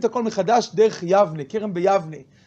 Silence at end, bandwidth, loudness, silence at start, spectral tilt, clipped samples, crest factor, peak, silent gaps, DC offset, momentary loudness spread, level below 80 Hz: 0.25 s; 8 kHz; -20 LUFS; 0 s; -5.5 dB/octave; under 0.1%; 16 dB; -4 dBFS; none; under 0.1%; 9 LU; -66 dBFS